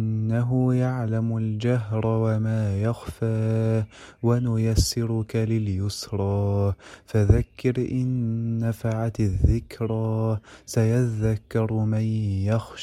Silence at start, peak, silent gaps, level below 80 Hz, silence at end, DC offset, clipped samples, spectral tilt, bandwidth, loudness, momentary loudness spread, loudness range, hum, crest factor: 0 s; -4 dBFS; none; -38 dBFS; 0 s; under 0.1%; under 0.1%; -7 dB/octave; 13.5 kHz; -25 LUFS; 6 LU; 1 LU; none; 18 dB